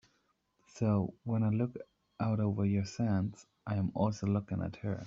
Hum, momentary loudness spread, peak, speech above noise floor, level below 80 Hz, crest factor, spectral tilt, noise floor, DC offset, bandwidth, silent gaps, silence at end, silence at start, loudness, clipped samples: none; 7 LU; -16 dBFS; 43 dB; -66 dBFS; 18 dB; -8.5 dB/octave; -76 dBFS; under 0.1%; 7.6 kHz; none; 0 s; 0.75 s; -34 LUFS; under 0.1%